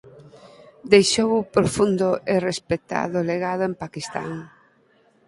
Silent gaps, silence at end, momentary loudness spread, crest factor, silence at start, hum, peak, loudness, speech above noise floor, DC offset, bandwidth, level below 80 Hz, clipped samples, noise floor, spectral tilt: none; 0.8 s; 14 LU; 22 dB; 0.05 s; none; 0 dBFS; -21 LUFS; 38 dB; under 0.1%; 11.5 kHz; -54 dBFS; under 0.1%; -60 dBFS; -4.5 dB/octave